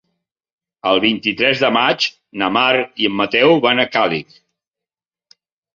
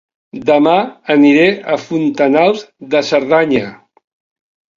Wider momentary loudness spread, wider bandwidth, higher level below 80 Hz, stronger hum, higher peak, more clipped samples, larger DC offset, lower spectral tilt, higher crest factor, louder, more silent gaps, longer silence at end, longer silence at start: second, 7 LU vs 10 LU; about the same, 7.4 kHz vs 7.4 kHz; about the same, -60 dBFS vs -58 dBFS; neither; about the same, -2 dBFS vs 0 dBFS; neither; neither; second, -4.5 dB/octave vs -6 dB/octave; about the same, 16 dB vs 14 dB; about the same, -15 LUFS vs -13 LUFS; neither; first, 1.55 s vs 1 s; first, 0.85 s vs 0.35 s